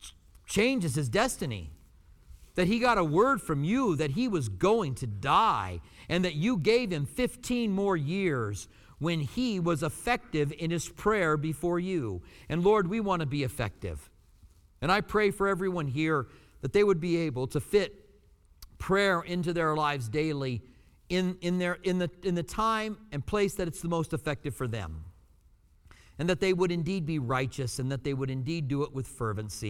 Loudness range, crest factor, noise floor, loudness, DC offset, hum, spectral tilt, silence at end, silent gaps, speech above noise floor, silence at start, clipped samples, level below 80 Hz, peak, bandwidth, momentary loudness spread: 4 LU; 18 dB; -61 dBFS; -29 LUFS; under 0.1%; none; -6 dB/octave; 0 s; none; 32 dB; 0 s; under 0.1%; -50 dBFS; -12 dBFS; 16.5 kHz; 10 LU